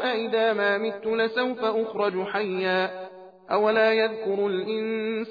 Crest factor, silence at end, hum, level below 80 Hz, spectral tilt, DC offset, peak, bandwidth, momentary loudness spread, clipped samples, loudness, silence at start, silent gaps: 14 dB; 0 s; none; -74 dBFS; -7 dB/octave; under 0.1%; -10 dBFS; 5 kHz; 7 LU; under 0.1%; -25 LUFS; 0 s; none